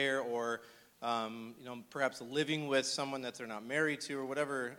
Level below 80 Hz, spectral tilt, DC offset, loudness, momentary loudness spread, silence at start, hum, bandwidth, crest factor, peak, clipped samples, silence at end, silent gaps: -84 dBFS; -3.5 dB/octave; under 0.1%; -37 LUFS; 11 LU; 0 s; none; 18.5 kHz; 20 dB; -16 dBFS; under 0.1%; 0 s; none